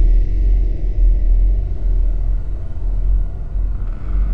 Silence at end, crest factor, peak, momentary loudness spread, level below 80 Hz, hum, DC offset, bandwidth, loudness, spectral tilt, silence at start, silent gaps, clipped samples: 0 s; 10 dB; -4 dBFS; 7 LU; -16 dBFS; none; 6%; 2.2 kHz; -21 LUFS; -10 dB/octave; 0 s; none; under 0.1%